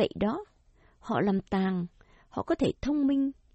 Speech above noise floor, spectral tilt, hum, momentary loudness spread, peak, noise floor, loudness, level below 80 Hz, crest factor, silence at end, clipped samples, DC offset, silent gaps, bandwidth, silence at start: 34 dB; -7.5 dB/octave; none; 12 LU; -14 dBFS; -62 dBFS; -30 LUFS; -52 dBFS; 16 dB; 0.25 s; under 0.1%; under 0.1%; none; 8.2 kHz; 0 s